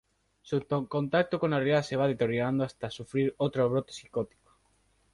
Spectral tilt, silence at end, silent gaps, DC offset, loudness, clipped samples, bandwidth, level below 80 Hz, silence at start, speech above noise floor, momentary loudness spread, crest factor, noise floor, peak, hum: -7 dB/octave; 0.9 s; none; under 0.1%; -30 LUFS; under 0.1%; 11.5 kHz; -64 dBFS; 0.45 s; 40 dB; 9 LU; 18 dB; -69 dBFS; -12 dBFS; none